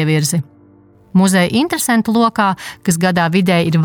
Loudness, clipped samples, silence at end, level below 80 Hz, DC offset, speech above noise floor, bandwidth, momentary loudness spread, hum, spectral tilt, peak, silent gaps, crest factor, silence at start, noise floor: -15 LUFS; under 0.1%; 0 s; -52 dBFS; under 0.1%; 33 dB; 19 kHz; 6 LU; none; -5 dB/octave; -2 dBFS; none; 12 dB; 0 s; -47 dBFS